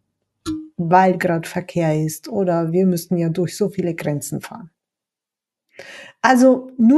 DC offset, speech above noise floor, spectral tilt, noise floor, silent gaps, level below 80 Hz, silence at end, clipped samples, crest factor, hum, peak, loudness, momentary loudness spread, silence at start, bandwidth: under 0.1%; 70 dB; -6.5 dB/octave; -87 dBFS; none; -58 dBFS; 0 s; under 0.1%; 18 dB; none; 0 dBFS; -19 LUFS; 18 LU; 0.45 s; 12.5 kHz